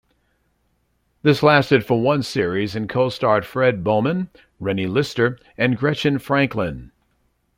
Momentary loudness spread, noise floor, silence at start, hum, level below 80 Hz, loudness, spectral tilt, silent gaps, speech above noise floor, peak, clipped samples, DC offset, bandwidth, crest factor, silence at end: 10 LU; -67 dBFS; 1.25 s; none; -52 dBFS; -20 LUFS; -6.5 dB/octave; none; 47 dB; -2 dBFS; under 0.1%; under 0.1%; 16.5 kHz; 20 dB; 0.75 s